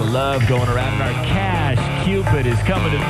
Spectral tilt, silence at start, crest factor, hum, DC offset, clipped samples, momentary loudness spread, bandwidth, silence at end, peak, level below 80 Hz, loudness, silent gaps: -6.5 dB/octave; 0 s; 12 dB; none; under 0.1%; under 0.1%; 2 LU; 13.5 kHz; 0 s; -6 dBFS; -30 dBFS; -18 LUFS; none